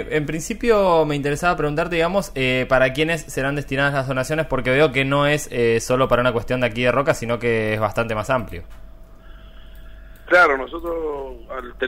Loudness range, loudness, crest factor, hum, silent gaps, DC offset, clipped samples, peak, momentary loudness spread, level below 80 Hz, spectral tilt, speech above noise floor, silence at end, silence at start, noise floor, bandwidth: 4 LU; -19 LUFS; 16 dB; none; none; under 0.1%; under 0.1%; -4 dBFS; 9 LU; -38 dBFS; -5 dB/octave; 21 dB; 0 s; 0 s; -40 dBFS; 16 kHz